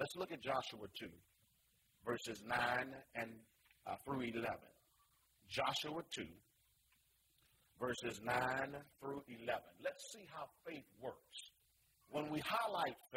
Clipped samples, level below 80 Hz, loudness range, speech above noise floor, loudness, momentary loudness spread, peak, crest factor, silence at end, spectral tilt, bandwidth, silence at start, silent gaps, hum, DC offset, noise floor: under 0.1%; -76 dBFS; 4 LU; 33 dB; -44 LUFS; 14 LU; -24 dBFS; 22 dB; 0 s; -4 dB/octave; 16 kHz; 0 s; none; none; under 0.1%; -77 dBFS